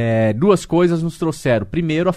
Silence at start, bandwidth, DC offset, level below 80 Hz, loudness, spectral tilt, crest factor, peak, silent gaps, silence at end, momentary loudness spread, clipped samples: 0 s; 14 kHz; under 0.1%; -44 dBFS; -17 LUFS; -7 dB/octave; 16 dB; 0 dBFS; none; 0 s; 5 LU; under 0.1%